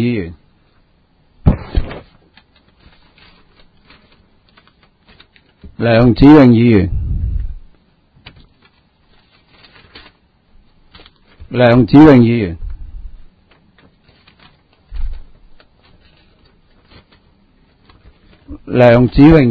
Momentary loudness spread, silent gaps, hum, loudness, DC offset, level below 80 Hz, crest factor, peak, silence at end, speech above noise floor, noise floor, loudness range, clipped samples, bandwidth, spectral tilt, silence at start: 25 LU; none; none; -10 LUFS; under 0.1%; -28 dBFS; 14 dB; 0 dBFS; 0 s; 46 dB; -54 dBFS; 16 LU; 0.5%; 5.6 kHz; -9.5 dB/octave; 0 s